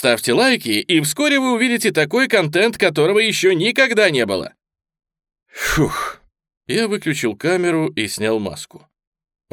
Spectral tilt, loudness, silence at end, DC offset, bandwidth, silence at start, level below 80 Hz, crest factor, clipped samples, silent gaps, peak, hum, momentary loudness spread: -4 dB/octave; -17 LUFS; 0.75 s; under 0.1%; 20 kHz; 0 s; -46 dBFS; 18 dB; under 0.1%; 6.57-6.61 s; 0 dBFS; none; 9 LU